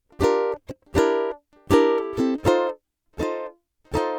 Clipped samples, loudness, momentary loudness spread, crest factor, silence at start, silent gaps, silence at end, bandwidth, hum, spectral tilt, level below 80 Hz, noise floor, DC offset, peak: under 0.1%; -23 LUFS; 15 LU; 20 dB; 0.2 s; none; 0 s; 18 kHz; none; -6 dB/octave; -44 dBFS; -41 dBFS; under 0.1%; -4 dBFS